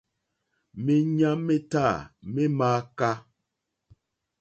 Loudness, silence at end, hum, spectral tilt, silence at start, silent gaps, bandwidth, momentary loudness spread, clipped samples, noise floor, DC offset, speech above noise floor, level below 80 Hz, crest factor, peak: -26 LUFS; 1.2 s; none; -7.5 dB/octave; 0.75 s; none; 8.4 kHz; 10 LU; under 0.1%; -82 dBFS; under 0.1%; 57 dB; -60 dBFS; 16 dB; -10 dBFS